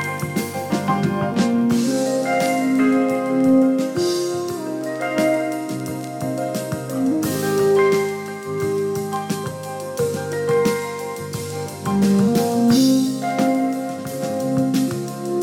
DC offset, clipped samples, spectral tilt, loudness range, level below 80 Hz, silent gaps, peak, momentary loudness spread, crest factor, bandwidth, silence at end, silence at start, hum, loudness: under 0.1%; under 0.1%; -5.5 dB/octave; 5 LU; -58 dBFS; none; -6 dBFS; 10 LU; 14 dB; 17.5 kHz; 0 s; 0 s; none; -20 LUFS